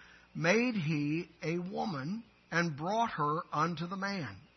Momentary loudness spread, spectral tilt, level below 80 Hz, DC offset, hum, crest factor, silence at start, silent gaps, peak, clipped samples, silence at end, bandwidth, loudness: 9 LU; -5 dB/octave; -72 dBFS; under 0.1%; none; 20 dB; 0 s; none; -14 dBFS; under 0.1%; 0.15 s; 6.2 kHz; -34 LUFS